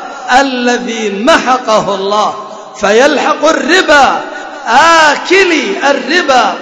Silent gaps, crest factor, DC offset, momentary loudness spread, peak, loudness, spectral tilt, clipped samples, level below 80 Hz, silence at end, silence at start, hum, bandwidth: none; 10 dB; under 0.1%; 10 LU; 0 dBFS; -9 LUFS; -2.5 dB/octave; 1%; -44 dBFS; 0 s; 0 s; none; 11 kHz